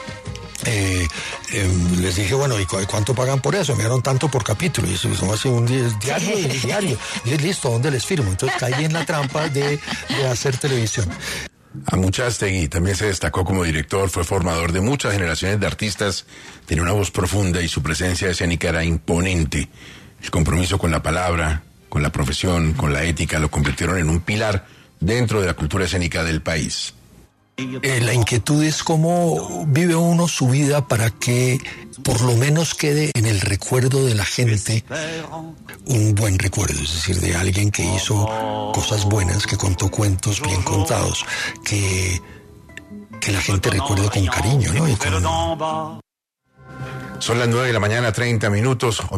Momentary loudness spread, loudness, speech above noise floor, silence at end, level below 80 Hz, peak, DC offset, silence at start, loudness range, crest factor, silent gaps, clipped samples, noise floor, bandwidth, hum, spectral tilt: 8 LU; -20 LUFS; 50 dB; 0 s; -38 dBFS; -4 dBFS; under 0.1%; 0 s; 3 LU; 14 dB; none; under 0.1%; -69 dBFS; 14 kHz; none; -4.5 dB/octave